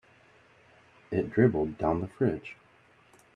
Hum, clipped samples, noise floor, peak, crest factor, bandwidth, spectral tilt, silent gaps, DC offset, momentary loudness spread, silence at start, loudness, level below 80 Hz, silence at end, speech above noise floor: none; under 0.1%; -61 dBFS; -8 dBFS; 22 dB; 9.6 kHz; -9.5 dB/octave; none; under 0.1%; 11 LU; 1.1 s; -29 LUFS; -58 dBFS; 0.85 s; 33 dB